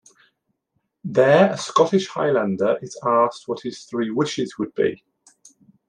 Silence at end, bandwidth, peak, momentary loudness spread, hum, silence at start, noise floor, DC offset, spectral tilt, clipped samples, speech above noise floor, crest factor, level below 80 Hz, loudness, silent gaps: 0.95 s; 10.5 kHz; -2 dBFS; 13 LU; none; 1.05 s; -74 dBFS; under 0.1%; -5.5 dB/octave; under 0.1%; 54 dB; 20 dB; -68 dBFS; -21 LUFS; none